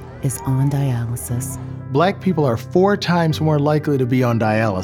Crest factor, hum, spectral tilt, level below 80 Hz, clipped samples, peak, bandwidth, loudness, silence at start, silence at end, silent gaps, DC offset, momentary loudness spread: 14 dB; none; -6.5 dB/octave; -46 dBFS; under 0.1%; -4 dBFS; 17 kHz; -19 LUFS; 0 s; 0 s; none; under 0.1%; 8 LU